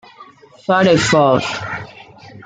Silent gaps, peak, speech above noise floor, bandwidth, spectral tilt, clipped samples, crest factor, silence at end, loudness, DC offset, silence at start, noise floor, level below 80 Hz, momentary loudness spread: none; -2 dBFS; 29 dB; 9.4 kHz; -5 dB/octave; under 0.1%; 16 dB; 0.05 s; -14 LUFS; under 0.1%; 0.2 s; -43 dBFS; -50 dBFS; 17 LU